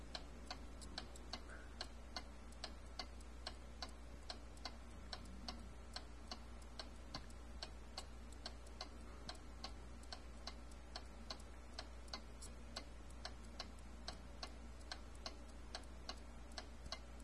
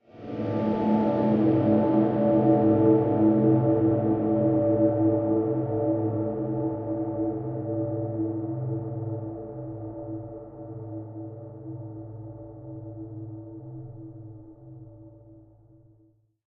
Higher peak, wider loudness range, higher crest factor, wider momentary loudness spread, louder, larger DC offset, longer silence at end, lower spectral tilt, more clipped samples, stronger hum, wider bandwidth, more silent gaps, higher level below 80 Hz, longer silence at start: second, -30 dBFS vs -8 dBFS; second, 1 LU vs 20 LU; about the same, 22 dB vs 18 dB; second, 3 LU vs 20 LU; second, -54 LUFS vs -25 LUFS; first, 0.1% vs under 0.1%; second, 0 s vs 1.1 s; second, -3.5 dB/octave vs -10.5 dB/octave; neither; neither; first, 12 kHz vs 4 kHz; neither; about the same, -56 dBFS vs -56 dBFS; second, 0 s vs 0.15 s